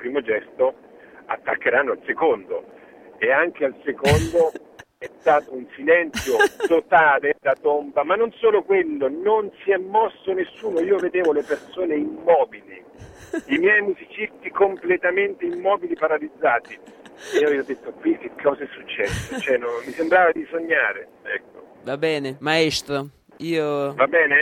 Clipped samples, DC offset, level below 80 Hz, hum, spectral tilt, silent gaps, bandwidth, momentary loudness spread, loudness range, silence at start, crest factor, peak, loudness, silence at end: under 0.1%; under 0.1%; -50 dBFS; none; -5 dB/octave; none; 16 kHz; 12 LU; 4 LU; 0 s; 18 dB; -4 dBFS; -21 LUFS; 0 s